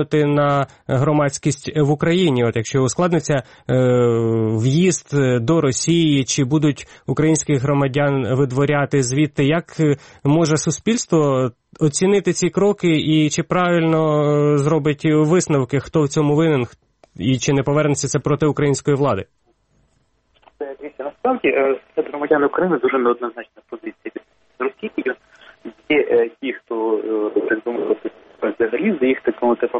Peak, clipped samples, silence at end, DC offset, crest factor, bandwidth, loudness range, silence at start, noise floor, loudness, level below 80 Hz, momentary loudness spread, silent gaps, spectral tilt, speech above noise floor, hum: -2 dBFS; under 0.1%; 0 s; under 0.1%; 16 dB; 8.8 kHz; 6 LU; 0 s; -62 dBFS; -18 LUFS; -52 dBFS; 9 LU; none; -5.5 dB/octave; 45 dB; none